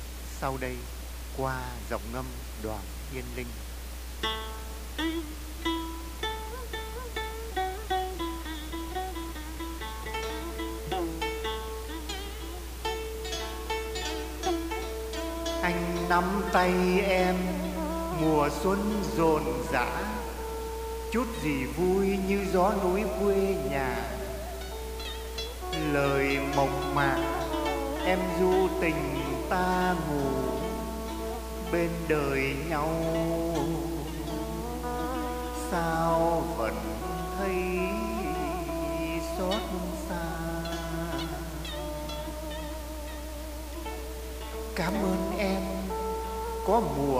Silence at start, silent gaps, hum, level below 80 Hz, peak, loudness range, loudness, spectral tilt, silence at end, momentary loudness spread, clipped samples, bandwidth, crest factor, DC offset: 0 s; none; none; -40 dBFS; -10 dBFS; 8 LU; -31 LUFS; -5 dB/octave; 0 s; 12 LU; under 0.1%; 15.5 kHz; 20 dB; under 0.1%